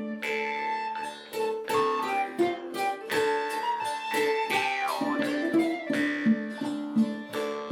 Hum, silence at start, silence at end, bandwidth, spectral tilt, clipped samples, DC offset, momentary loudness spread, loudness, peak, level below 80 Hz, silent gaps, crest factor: none; 0 s; 0 s; 18 kHz; -4.5 dB/octave; under 0.1%; under 0.1%; 6 LU; -28 LUFS; -12 dBFS; -74 dBFS; none; 16 dB